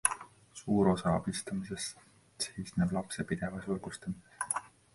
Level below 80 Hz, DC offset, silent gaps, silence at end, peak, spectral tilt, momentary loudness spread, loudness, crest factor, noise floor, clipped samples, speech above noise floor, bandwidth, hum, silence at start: -58 dBFS; under 0.1%; none; 0.25 s; -6 dBFS; -4.5 dB/octave; 13 LU; -35 LUFS; 28 dB; -53 dBFS; under 0.1%; 19 dB; 12 kHz; none; 0.05 s